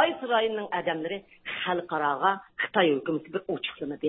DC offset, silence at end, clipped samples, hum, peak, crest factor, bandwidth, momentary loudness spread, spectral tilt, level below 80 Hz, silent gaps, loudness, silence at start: under 0.1%; 0 s; under 0.1%; none; -6 dBFS; 22 dB; 4.1 kHz; 9 LU; -9 dB/octave; -70 dBFS; none; -28 LUFS; 0 s